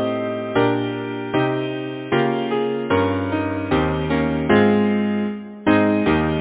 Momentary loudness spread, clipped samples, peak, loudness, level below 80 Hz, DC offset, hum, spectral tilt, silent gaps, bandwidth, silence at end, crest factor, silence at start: 8 LU; under 0.1%; -2 dBFS; -20 LUFS; -40 dBFS; under 0.1%; none; -11 dB/octave; none; 4 kHz; 0 s; 18 dB; 0 s